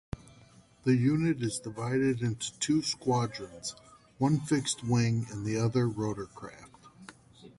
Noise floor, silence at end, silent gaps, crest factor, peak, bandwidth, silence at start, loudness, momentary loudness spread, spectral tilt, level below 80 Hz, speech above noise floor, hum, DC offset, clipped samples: -58 dBFS; 0.1 s; none; 16 dB; -14 dBFS; 11.5 kHz; 0.15 s; -30 LUFS; 16 LU; -5.5 dB/octave; -58 dBFS; 28 dB; none; under 0.1%; under 0.1%